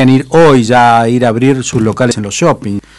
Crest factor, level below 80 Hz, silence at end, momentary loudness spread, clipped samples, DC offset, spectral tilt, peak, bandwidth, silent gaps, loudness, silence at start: 8 dB; -40 dBFS; 0.2 s; 6 LU; under 0.1%; under 0.1%; -5.5 dB/octave; 0 dBFS; 11.5 kHz; none; -9 LUFS; 0 s